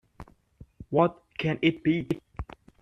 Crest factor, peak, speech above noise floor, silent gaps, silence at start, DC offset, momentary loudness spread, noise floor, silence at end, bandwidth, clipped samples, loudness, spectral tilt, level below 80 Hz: 22 dB; -8 dBFS; 29 dB; none; 0.2 s; under 0.1%; 17 LU; -54 dBFS; 0.4 s; 6.8 kHz; under 0.1%; -27 LUFS; -8 dB/octave; -52 dBFS